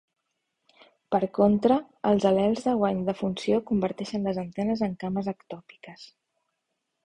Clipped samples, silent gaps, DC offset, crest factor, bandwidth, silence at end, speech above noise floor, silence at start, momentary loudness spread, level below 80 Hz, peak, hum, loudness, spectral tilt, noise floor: under 0.1%; none; under 0.1%; 20 dB; 9.6 kHz; 1 s; 55 dB; 1.1 s; 13 LU; -60 dBFS; -8 dBFS; none; -26 LUFS; -7.5 dB/octave; -80 dBFS